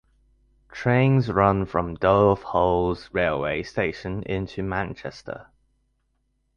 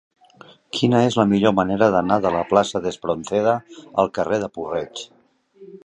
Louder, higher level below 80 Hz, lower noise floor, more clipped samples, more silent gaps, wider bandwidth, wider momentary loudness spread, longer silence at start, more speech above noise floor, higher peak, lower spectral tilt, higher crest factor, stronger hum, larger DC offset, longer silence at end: second, -23 LUFS vs -20 LUFS; first, -44 dBFS vs -54 dBFS; first, -71 dBFS vs -49 dBFS; neither; neither; second, 7 kHz vs 10.5 kHz; first, 16 LU vs 10 LU; about the same, 0.7 s vs 0.75 s; first, 48 dB vs 29 dB; about the same, -4 dBFS vs -2 dBFS; first, -8 dB/octave vs -6 dB/octave; about the same, 20 dB vs 20 dB; neither; neither; first, 1.15 s vs 0.1 s